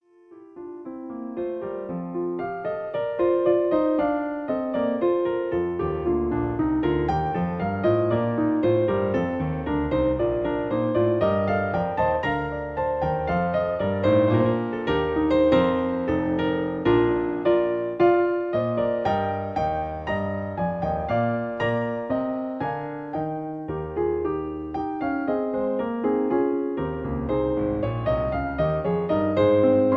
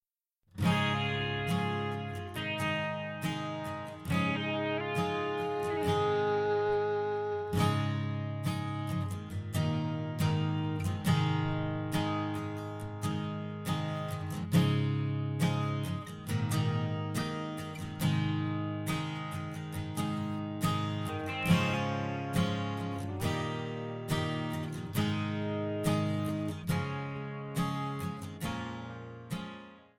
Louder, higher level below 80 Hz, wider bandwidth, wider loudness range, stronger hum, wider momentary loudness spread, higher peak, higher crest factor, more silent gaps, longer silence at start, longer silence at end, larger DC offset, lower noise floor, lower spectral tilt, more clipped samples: first, -24 LUFS vs -33 LUFS; first, -44 dBFS vs -58 dBFS; second, 6 kHz vs 16.5 kHz; about the same, 5 LU vs 3 LU; neither; about the same, 9 LU vs 9 LU; first, -8 dBFS vs -12 dBFS; about the same, 16 dB vs 20 dB; neither; second, 0.3 s vs 0.55 s; second, 0 s vs 0.15 s; neither; second, -49 dBFS vs -77 dBFS; first, -9.5 dB/octave vs -6 dB/octave; neither